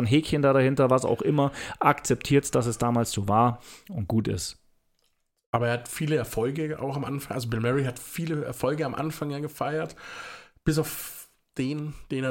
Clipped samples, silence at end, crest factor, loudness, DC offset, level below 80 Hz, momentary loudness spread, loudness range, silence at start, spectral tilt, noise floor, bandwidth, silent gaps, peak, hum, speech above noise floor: under 0.1%; 0 s; 20 dB; -27 LUFS; under 0.1%; -52 dBFS; 13 LU; 7 LU; 0 s; -6 dB/octave; -72 dBFS; 17 kHz; 5.46-5.53 s; -6 dBFS; none; 46 dB